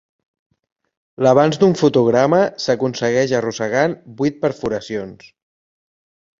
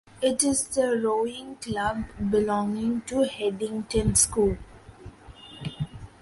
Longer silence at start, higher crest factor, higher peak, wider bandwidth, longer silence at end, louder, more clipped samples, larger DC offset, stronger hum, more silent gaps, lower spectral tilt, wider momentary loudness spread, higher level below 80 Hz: first, 1.2 s vs 0.15 s; about the same, 18 dB vs 20 dB; first, -2 dBFS vs -6 dBFS; second, 7.8 kHz vs 12 kHz; first, 1.25 s vs 0.15 s; first, -17 LUFS vs -25 LUFS; neither; neither; neither; neither; first, -6 dB/octave vs -4 dB/octave; second, 10 LU vs 15 LU; second, -56 dBFS vs -44 dBFS